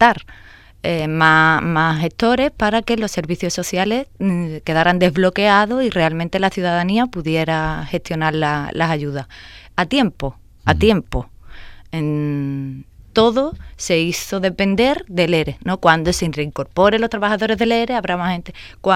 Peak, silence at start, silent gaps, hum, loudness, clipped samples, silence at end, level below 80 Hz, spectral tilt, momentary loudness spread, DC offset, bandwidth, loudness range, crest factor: 0 dBFS; 0 s; none; none; -18 LUFS; under 0.1%; 0 s; -38 dBFS; -5.5 dB/octave; 12 LU; under 0.1%; 16 kHz; 4 LU; 18 dB